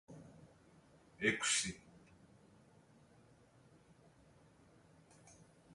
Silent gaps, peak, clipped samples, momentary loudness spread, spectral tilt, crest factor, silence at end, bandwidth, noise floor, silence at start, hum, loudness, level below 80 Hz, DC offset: none; -18 dBFS; under 0.1%; 29 LU; -1.5 dB/octave; 28 dB; 0 s; 11.5 kHz; -67 dBFS; 0.1 s; none; -36 LUFS; -74 dBFS; under 0.1%